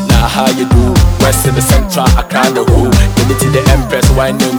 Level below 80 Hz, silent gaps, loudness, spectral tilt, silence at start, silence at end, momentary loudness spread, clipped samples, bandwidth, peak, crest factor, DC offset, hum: -14 dBFS; none; -10 LUFS; -5 dB/octave; 0 s; 0 s; 2 LU; 0.3%; 19 kHz; 0 dBFS; 8 dB; under 0.1%; none